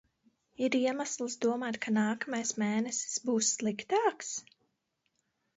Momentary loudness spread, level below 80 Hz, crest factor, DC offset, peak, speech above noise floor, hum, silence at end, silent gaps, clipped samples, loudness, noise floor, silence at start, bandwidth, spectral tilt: 6 LU; -80 dBFS; 18 dB; under 0.1%; -16 dBFS; 49 dB; none; 1.15 s; none; under 0.1%; -32 LUFS; -80 dBFS; 0.6 s; 8.2 kHz; -3 dB/octave